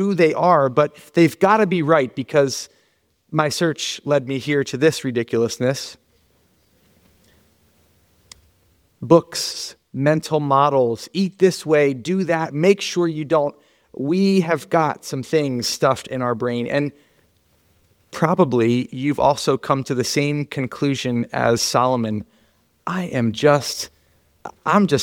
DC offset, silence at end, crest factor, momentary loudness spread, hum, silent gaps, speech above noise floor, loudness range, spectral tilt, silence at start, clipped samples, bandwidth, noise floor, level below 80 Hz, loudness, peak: under 0.1%; 0 s; 18 dB; 10 LU; none; none; 45 dB; 5 LU; -5.5 dB/octave; 0 s; under 0.1%; 18 kHz; -64 dBFS; -60 dBFS; -19 LUFS; -2 dBFS